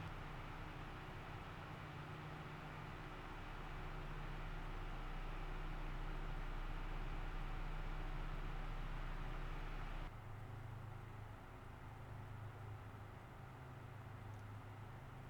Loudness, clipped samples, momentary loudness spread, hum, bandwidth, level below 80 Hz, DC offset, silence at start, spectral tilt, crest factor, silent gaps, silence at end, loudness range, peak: -52 LUFS; under 0.1%; 5 LU; none; 17 kHz; -50 dBFS; under 0.1%; 0 s; -6.5 dB/octave; 12 dB; none; 0 s; 4 LU; -36 dBFS